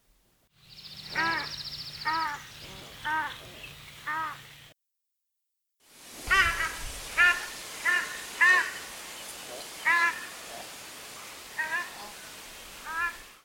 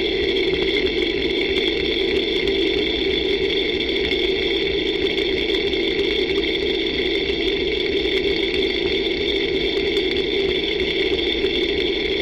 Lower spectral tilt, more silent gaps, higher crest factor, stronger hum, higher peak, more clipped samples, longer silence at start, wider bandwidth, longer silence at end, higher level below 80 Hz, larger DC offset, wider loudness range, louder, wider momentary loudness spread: second, -1 dB/octave vs -5 dB/octave; neither; first, 22 dB vs 14 dB; neither; about the same, -10 dBFS vs -8 dBFS; neither; first, 0.7 s vs 0 s; first, over 20 kHz vs 10 kHz; about the same, 0.05 s vs 0 s; second, -52 dBFS vs -38 dBFS; neither; first, 11 LU vs 1 LU; second, -28 LUFS vs -20 LUFS; first, 20 LU vs 1 LU